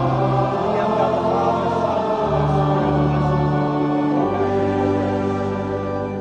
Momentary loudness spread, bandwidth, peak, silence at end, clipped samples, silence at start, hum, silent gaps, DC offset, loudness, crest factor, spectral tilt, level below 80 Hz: 4 LU; 8.6 kHz; -6 dBFS; 0 s; under 0.1%; 0 s; none; none; under 0.1%; -20 LUFS; 14 dB; -8.5 dB/octave; -40 dBFS